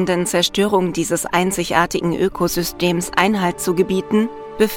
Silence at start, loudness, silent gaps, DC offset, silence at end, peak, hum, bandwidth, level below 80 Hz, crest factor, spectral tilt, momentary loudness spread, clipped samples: 0 s; -18 LUFS; none; under 0.1%; 0 s; 0 dBFS; none; 19 kHz; -44 dBFS; 18 dB; -4.5 dB/octave; 3 LU; under 0.1%